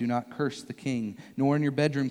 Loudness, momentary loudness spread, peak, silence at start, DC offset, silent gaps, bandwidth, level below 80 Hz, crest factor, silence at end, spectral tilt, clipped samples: -29 LUFS; 9 LU; -12 dBFS; 0 s; under 0.1%; none; 12 kHz; -72 dBFS; 16 dB; 0 s; -7 dB/octave; under 0.1%